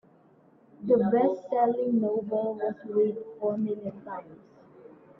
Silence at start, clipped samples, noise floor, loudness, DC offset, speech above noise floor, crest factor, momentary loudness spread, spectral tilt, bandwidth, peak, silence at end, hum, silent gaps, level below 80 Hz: 0.8 s; under 0.1%; -59 dBFS; -27 LUFS; under 0.1%; 32 dB; 18 dB; 14 LU; -10.5 dB/octave; 5.6 kHz; -12 dBFS; 0.3 s; none; none; -74 dBFS